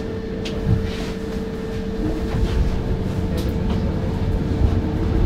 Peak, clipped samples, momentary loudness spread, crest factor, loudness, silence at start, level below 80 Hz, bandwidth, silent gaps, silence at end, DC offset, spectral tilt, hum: -6 dBFS; under 0.1%; 6 LU; 16 dB; -23 LUFS; 0 s; -26 dBFS; 15 kHz; none; 0 s; under 0.1%; -7.5 dB/octave; none